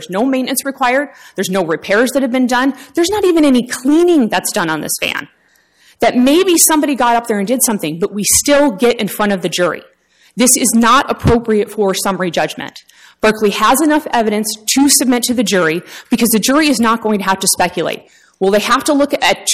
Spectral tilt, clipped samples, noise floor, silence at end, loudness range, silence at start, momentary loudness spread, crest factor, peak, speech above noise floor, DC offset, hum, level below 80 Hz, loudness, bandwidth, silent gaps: -3 dB/octave; under 0.1%; -52 dBFS; 0 s; 2 LU; 0 s; 8 LU; 14 dB; 0 dBFS; 39 dB; under 0.1%; none; -40 dBFS; -13 LUFS; 16 kHz; none